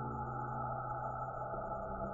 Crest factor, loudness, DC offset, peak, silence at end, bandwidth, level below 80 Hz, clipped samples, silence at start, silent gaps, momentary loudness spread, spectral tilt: 12 dB; -41 LUFS; under 0.1%; -30 dBFS; 0 s; 7 kHz; -54 dBFS; under 0.1%; 0 s; none; 2 LU; -11 dB/octave